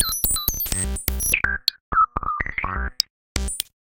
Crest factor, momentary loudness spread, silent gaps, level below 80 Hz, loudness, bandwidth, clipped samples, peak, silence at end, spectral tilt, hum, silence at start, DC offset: 24 dB; 7 LU; 1.80-1.92 s, 3.10-3.35 s; -32 dBFS; -22 LUFS; 17.5 kHz; under 0.1%; 0 dBFS; 0.2 s; -1.5 dB/octave; none; 0 s; under 0.1%